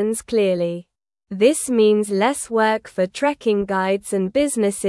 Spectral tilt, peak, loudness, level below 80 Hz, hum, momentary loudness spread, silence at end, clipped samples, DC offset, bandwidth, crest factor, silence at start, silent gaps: -4.5 dB/octave; -4 dBFS; -19 LUFS; -56 dBFS; none; 6 LU; 0 s; under 0.1%; under 0.1%; 12 kHz; 16 dB; 0 s; none